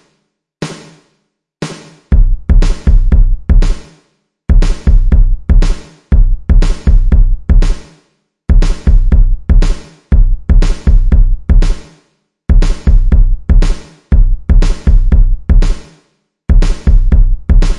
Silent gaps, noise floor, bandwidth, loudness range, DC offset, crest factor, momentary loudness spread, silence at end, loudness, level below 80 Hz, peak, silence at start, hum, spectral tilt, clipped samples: none; -64 dBFS; 7.6 kHz; 2 LU; under 0.1%; 8 dB; 13 LU; 0 s; -13 LUFS; -8 dBFS; 0 dBFS; 0.6 s; none; -7 dB/octave; under 0.1%